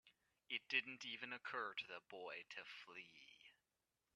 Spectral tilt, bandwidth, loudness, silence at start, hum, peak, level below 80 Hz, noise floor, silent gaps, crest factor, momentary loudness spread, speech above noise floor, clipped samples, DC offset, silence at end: -2 dB/octave; 11.5 kHz; -48 LUFS; 0.05 s; none; -26 dBFS; under -90 dBFS; under -90 dBFS; none; 26 dB; 20 LU; over 40 dB; under 0.1%; under 0.1%; 0.65 s